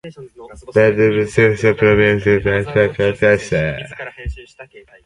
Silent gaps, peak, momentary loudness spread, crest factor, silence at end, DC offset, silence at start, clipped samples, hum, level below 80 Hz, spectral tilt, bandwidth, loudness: none; 0 dBFS; 17 LU; 16 dB; 0.25 s; under 0.1%; 0.05 s; under 0.1%; none; -38 dBFS; -6.5 dB/octave; 11 kHz; -15 LUFS